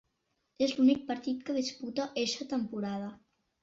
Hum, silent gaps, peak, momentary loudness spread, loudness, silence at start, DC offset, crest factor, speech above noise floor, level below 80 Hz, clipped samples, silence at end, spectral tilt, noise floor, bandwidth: none; none; -16 dBFS; 10 LU; -32 LUFS; 0.6 s; under 0.1%; 18 dB; 48 dB; -72 dBFS; under 0.1%; 0.45 s; -4.5 dB/octave; -80 dBFS; 7.8 kHz